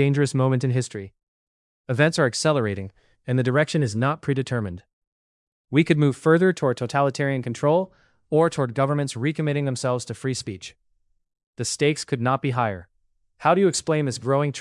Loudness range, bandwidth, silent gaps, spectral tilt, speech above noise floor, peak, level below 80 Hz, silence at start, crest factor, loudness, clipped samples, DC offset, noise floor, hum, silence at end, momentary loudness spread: 5 LU; 12 kHz; 1.23-1.84 s, 4.93-5.64 s, 11.46-11.53 s; -6 dB/octave; 47 dB; -4 dBFS; -64 dBFS; 0 s; 20 dB; -23 LUFS; under 0.1%; under 0.1%; -69 dBFS; none; 0 s; 13 LU